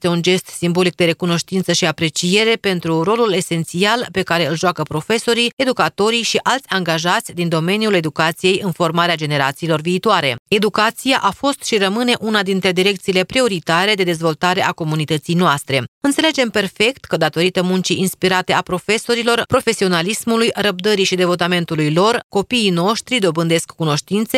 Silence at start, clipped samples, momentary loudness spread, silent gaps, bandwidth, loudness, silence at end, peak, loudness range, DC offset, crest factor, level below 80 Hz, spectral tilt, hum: 0 s; under 0.1%; 4 LU; 5.53-5.57 s, 10.39-10.46 s, 15.88-16.01 s, 22.24-22.30 s; 16 kHz; -16 LUFS; 0 s; 0 dBFS; 1 LU; under 0.1%; 16 dB; -54 dBFS; -4 dB/octave; none